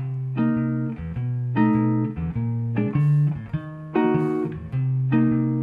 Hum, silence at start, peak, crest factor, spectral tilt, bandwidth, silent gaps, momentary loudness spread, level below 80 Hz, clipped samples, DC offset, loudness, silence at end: none; 0 s; -8 dBFS; 14 dB; -11 dB/octave; 4 kHz; none; 8 LU; -46 dBFS; under 0.1%; under 0.1%; -23 LUFS; 0 s